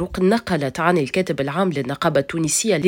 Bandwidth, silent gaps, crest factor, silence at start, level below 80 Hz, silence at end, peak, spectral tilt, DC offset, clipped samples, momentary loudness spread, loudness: 17 kHz; none; 16 dB; 0 s; -48 dBFS; 0 s; -4 dBFS; -4.5 dB/octave; under 0.1%; under 0.1%; 4 LU; -20 LUFS